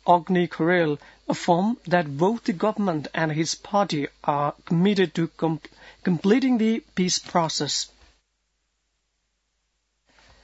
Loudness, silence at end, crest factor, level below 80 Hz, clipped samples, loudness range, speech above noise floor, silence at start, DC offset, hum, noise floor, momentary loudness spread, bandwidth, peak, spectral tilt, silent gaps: -24 LUFS; 2.55 s; 20 dB; -62 dBFS; under 0.1%; 4 LU; 51 dB; 0.05 s; under 0.1%; none; -74 dBFS; 7 LU; 8 kHz; -4 dBFS; -5 dB/octave; none